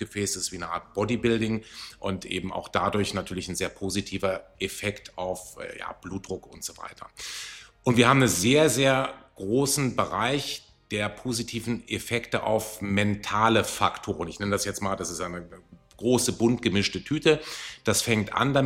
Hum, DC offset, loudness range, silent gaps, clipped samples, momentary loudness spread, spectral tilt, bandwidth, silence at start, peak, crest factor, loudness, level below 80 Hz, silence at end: none; under 0.1%; 9 LU; none; under 0.1%; 15 LU; -4 dB/octave; 16 kHz; 0 s; -4 dBFS; 22 dB; -26 LUFS; -54 dBFS; 0 s